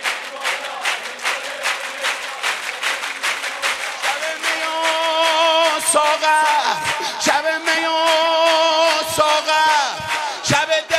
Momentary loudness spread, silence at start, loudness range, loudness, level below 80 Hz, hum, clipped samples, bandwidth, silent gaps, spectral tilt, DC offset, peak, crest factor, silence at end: 7 LU; 0 s; 6 LU; -18 LUFS; -62 dBFS; none; under 0.1%; 16 kHz; none; -1 dB/octave; under 0.1%; 0 dBFS; 18 dB; 0 s